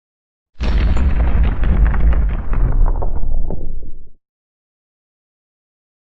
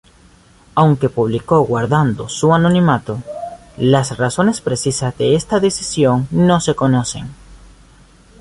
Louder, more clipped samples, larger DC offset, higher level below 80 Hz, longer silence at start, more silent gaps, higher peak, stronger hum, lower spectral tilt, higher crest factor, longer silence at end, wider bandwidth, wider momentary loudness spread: second, -19 LUFS vs -15 LUFS; neither; neither; first, -16 dBFS vs -44 dBFS; second, 0.45 s vs 0.75 s; first, 0.49-0.53 s vs none; about the same, -4 dBFS vs -2 dBFS; neither; first, -8.5 dB/octave vs -6 dB/octave; about the same, 12 dB vs 14 dB; first, 1.75 s vs 0.85 s; second, 5.8 kHz vs 11.5 kHz; about the same, 12 LU vs 11 LU